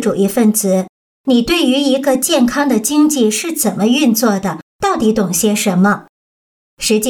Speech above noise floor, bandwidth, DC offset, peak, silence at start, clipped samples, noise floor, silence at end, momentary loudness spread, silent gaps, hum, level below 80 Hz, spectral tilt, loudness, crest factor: over 77 dB; 19 kHz; under 0.1%; -2 dBFS; 0 s; under 0.1%; under -90 dBFS; 0 s; 7 LU; 0.89-1.24 s, 4.62-4.79 s, 6.09-6.77 s; none; -46 dBFS; -4 dB/octave; -14 LUFS; 12 dB